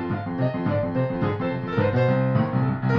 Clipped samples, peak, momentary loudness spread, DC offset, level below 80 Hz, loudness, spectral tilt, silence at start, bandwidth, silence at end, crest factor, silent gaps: under 0.1%; -8 dBFS; 5 LU; under 0.1%; -50 dBFS; -24 LUFS; -10 dB/octave; 0 s; 5.6 kHz; 0 s; 14 dB; none